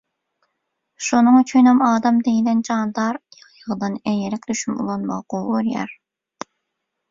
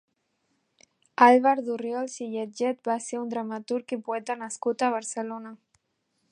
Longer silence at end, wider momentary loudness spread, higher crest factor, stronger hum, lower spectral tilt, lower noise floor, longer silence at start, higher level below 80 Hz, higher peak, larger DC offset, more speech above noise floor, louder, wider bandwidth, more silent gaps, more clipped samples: first, 1.15 s vs 0.75 s; first, 19 LU vs 15 LU; second, 16 dB vs 24 dB; neither; first, -5 dB/octave vs -3.5 dB/octave; about the same, -78 dBFS vs -75 dBFS; second, 1 s vs 1.2 s; first, -62 dBFS vs -84 dBFS; about the same, -4 dBFS vs -2 dBFS; neither; first, 60 dB vs 49 dB; first, -19 LUFS vs -26 LUFS; second, 7.8 kHz vs 11 kHz; neither; neither